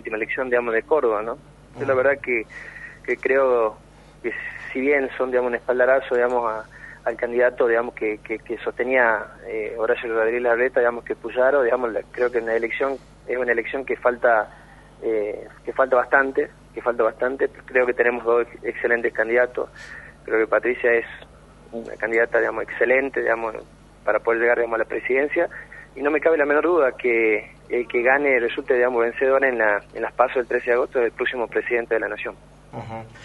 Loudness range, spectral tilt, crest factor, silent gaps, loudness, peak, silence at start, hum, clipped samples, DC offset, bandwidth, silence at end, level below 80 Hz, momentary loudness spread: 3 LU; -6 dB/octave; 20 dB; none; -22 LUFS; -2 dBFS; 0.05 s; 50 Hz at -50 dBFS; under 0.1%; under 0.1%; 11 kHz; 0 s; -52 dBFS; 12 LU